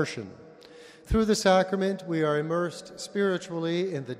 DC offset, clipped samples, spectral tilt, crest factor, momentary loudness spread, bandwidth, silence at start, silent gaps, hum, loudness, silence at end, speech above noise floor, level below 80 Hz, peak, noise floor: under 0.1%; under 0.1%; -5 dB/octave; 18 dB; 12 LU; 15 kHz; 0 s; none; none; -27 LUFS; 0 s; 23 dB; -44 dBFS; -8 dBFS; -50 dBFS